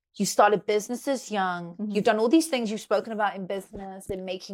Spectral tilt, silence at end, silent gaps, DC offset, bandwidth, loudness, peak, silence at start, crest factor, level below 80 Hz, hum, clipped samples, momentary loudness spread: -4.5 dB/octave; 0 s; none; under 0.1%; 17 kHz; -26 LUFS; -6 dBFS; 0.15 s; 20 dB; -60 dBFS; none; under 0.1%; 13 LU